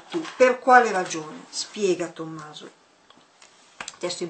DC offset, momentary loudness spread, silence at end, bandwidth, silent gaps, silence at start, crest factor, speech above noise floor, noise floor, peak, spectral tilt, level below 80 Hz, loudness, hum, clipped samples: under 0.1%; 22 LU; 0 s; 9 kHz; none; 0.1 s; 24 dB; 33 dB; -56 dBFS; 0 dBFS; -3 dB/octave; -76 dBFS; -22 LUFS; none; under 0.1%